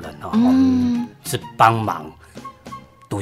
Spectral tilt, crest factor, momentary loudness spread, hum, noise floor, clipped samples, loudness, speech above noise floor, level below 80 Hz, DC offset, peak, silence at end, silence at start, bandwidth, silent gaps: -6 dB/octave; 20 dB; 23 LU; none; -39 dBFS; under 0.1%; -18 LUFS; 22 dB; -54 dBFS; under 0.1%; 0 dBFS; 0 s; 0 s; 15.5 kHz; none